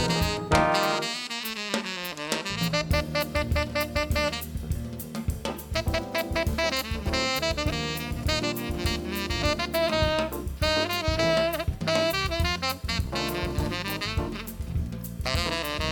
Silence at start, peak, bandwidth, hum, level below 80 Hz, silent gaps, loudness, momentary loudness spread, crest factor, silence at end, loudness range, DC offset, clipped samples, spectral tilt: 0 s; -6 dBFS; 19.5 kHz; none; -38 dBFS; none; -27 LUFS; 8 LU; 22 dB; 0 s; 3 LU; under 0.1%; under 0.1%; -4.5 dB/octave